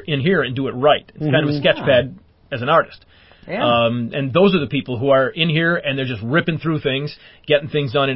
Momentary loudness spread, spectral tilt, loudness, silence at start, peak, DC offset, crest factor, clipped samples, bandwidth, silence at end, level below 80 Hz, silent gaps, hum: 8 LU; -11 dB/octave; -18 LUFS; 0 s; -2 dBFS; under 0.1%; 16 dB; under 0.1%; 5.8 kHz; 0 s; -50 dBFS; none; none